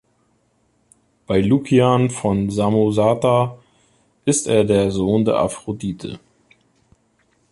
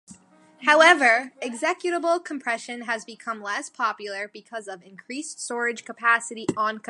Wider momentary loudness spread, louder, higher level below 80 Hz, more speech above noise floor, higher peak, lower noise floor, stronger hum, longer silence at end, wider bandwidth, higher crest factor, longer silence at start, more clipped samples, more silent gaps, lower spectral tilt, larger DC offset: second, 11 LU vs 19 LU; first, -18 LUFS vs -23 LUFS; first, -46 dBFS vs -74 dBFS; first, 46 dB vs 27 dB; about the same, -2 dBFS vs -2 dBFS; first, -63 dBFS vs -51 dBFS; neither; first, 1.35 s vs 0.1 s; about the same, 11.5 kHz vs 11.5 kHz; about the same, 18 dB vs 22 dB; first, 1.3 s vs 0.1 s; neither; neither; first, -6 dB/octave vs -2 dB/octave; neither